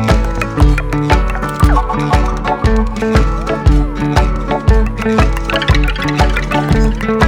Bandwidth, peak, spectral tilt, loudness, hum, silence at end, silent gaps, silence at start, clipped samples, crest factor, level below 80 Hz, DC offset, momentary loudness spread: 13 kHz; 0 dBFS; -6.5 dB/octave; -14 LUFS; none; 0 s; none; 0 s; under 0.1%; 12 dB; -16 dBFS; under 0.1%; 3 LU